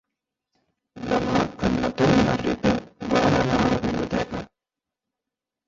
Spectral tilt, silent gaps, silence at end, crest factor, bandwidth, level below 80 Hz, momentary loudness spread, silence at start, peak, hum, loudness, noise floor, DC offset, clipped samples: -6 dB/octave; none; 1.25 s; 18 dB; 7.8 kHz; -42 dBFS; 8 LU; 0.95 s; -6 dBFS; none; -23 LUFS; -87 dBFS; under 0.1%; under 0.1%